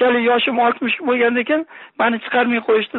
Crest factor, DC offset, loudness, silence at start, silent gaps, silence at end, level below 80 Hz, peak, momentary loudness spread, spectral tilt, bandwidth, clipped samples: 14 dB; under 0.1%; -17 LUFS; 0 s; none; 0 s; -66 dBFS; -4 dBFS; 5 LU; -1 dB/octave; 4.2 kHz; under 0.1%